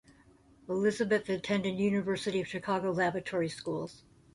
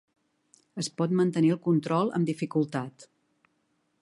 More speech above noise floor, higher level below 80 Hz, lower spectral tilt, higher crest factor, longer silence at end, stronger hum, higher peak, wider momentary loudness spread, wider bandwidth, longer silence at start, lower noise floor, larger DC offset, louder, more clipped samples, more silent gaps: second, 30 dB vs 47 dB; first, -66 dBFS vs -76 dBFS; second, -5.5 dB/octave vs -7 dB/octave; about the same, 16 dB vs 16 dB; second, 0.35 s vs 0.95 s; neither; second, -16 dBFS vs -12 dBFS; second, 7 LU vs 11 LU; about the same, 11.5 kHz vs 11.5 kHz; about the same, 0.7 s vs 0.75 s; second, -61 dBFS vs -74 dBFS; neither; second, -32 LUFS vs -27 LUFS; neither; neither